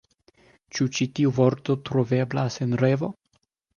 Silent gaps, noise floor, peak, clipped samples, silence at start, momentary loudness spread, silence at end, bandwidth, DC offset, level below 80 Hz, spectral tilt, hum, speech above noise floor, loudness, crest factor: none; -71 dBFS; -6 dBFS; under 0.1%; 0.75 s; 6 LU; 0.65 s; 7.2 kHz; under 0.1%; -62 dBFS; -6.5 dB/octave; none; 47 dB; -24 LUFS; 18 dB